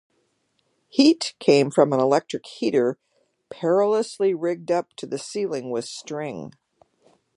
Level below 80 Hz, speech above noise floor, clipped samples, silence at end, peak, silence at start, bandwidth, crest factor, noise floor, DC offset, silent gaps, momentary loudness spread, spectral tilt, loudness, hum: -74 dBFS; 48 dB; under 0.1%; 0.9 s; -2 dBFS; 0.95 s; 11.5 kHz; 22 dB; -70 dBFS; under 0.1%; none; 14 LU; -5 dB/octave; -23 LUFS; none